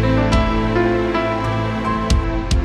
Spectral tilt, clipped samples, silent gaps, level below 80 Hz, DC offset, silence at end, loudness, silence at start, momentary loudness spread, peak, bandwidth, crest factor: -6.5 dB/octave; under 0.1%; none; -22 dBFS; under 0.1%; 0 s; -18 LUFS; 0 s; 4 LU; -2 dBFS; 12 kHz; 14 dB